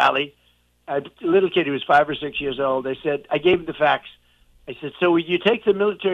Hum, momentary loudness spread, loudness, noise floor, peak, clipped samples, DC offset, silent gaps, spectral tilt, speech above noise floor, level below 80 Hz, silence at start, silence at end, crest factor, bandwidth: 60 Hz at -65 dBFS; 10 LU; -21 LUFS; -50 dBFS; -6 dBFS; under 0.1%; under 0.1%; none; -6.5 dB/octave; 30 dB; -56 dBFS; 0 s; 0 s; 16 dB; 7.2 kHz